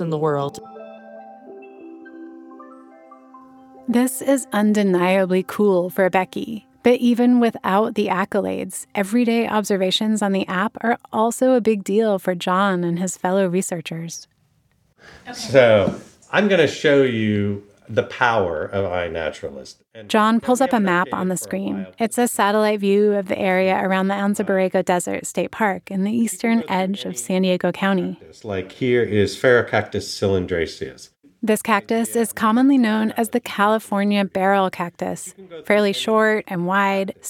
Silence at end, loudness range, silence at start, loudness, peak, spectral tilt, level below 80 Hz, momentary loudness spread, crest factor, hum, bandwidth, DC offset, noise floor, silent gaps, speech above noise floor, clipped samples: 0 s; 3 LU; 0 s; -20 LUFS; 0 dBFS; -5 dB/octave; -62 dBFS; 13 LU; 20 dB; none; 17 kHz; under 0.1%; -62 dBFS; none; 43 dB; under 0.1%